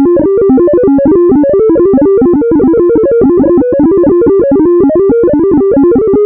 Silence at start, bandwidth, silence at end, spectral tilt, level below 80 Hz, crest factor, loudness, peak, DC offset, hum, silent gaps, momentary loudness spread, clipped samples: 0 s; 2.6 kHz; 0 s; -14.5 dB/octave; -32 dBFS; 6 dB; -7 LUFS; 0 dBFS; under 0.1%; none; none; 1 LU; under 0.1%